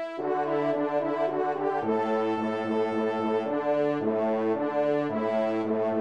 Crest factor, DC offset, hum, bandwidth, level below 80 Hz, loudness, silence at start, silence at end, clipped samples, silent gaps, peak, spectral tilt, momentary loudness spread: 12 dB; 0.1%; none; 8.4 kHz; -76 dBFS; -27 LUFS; 0 s; 0 s; under 0.1%; none; -14 dBFS; -7.5 dB/octave; 2 LU